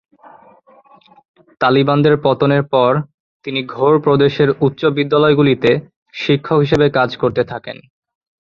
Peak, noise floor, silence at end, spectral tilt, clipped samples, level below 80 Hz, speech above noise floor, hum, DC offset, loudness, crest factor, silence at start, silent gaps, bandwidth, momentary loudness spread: -2 dBFS; -47 dBFS; 0.75 s; -8 dB/octave; under 0.1%; -50 dBFS; 33 dB; none; under 0.1%; -15 LUFS; 14 dB; 1.6 s; 3.14-3.40 s, 5.96-6.06 s; 7 kHz; 11 LU